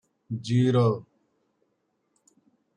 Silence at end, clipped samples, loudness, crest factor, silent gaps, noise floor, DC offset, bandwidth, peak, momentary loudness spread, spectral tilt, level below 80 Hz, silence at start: 1.75 s; under 0.1%; -25 LUFS; 16 dB; none; -75 dBFS; under 0.1%; 9.8 kHz; -12 dBFS; 14 LU; -8 dB/octave; -68 dBFS; 0.3 s